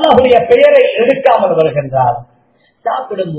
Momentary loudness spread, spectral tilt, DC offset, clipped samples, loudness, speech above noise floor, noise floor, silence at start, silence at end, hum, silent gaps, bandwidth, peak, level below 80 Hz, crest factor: 12 LU; -9.5 dB/octave; under 0.1%; 1%; -10 LUFS; 44 dB; -54 dBFS; 0 s; 0 s; none; none; 4 kHz; 0 dBFS; -44 dBFS; 10 dB